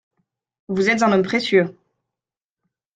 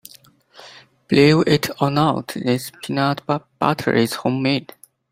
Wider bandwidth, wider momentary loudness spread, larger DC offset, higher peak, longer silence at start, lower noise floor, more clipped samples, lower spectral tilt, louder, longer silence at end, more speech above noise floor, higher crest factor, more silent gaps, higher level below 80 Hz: second, 9.2 kHz vs 16.5 kHz; about the same, 9 LU vs 10 LU; neither; about the same, -4 dBFS vs -2 dBFS; about the same, 0.7 s vs 0.6 s; first, -89 dBFS vs -50 dBFS; neither; about the same, -5.5 dB/octave vs -6 dB/octave; about the same, -19 LUFS vs -19 LUFS; first, 1.25 s vs 0.5 s; first, 71 dB vs 31 dB; about the same, 18 dB vs 18 dB; neither; second, -64 dBFS vs -56 dBFS